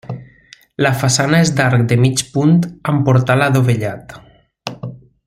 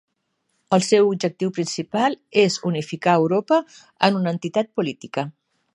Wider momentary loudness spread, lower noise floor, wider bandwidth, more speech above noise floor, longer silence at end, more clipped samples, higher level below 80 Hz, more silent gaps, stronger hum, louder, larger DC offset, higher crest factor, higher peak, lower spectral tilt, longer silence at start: first, 18 LU vs 9 LU; second, -46 dBFS vs -73 dBFS; first, 15.5 kHz vs 11.5 kHz; second, 33 dB vs 52 dB; second, 0.3 s vs 0.45 s; neither; first, -48 dBFS vs -70 dBFS; neither; neither; first, -14 LUFS vs -21 LUFS; neither; second, 14 dB vs 20 dB; about the same, 0 dBFS vs 0 dBFS; about the same, -5.5 dB/octave vs -5 dB/octave; second, 0.1 s vs 0.7 s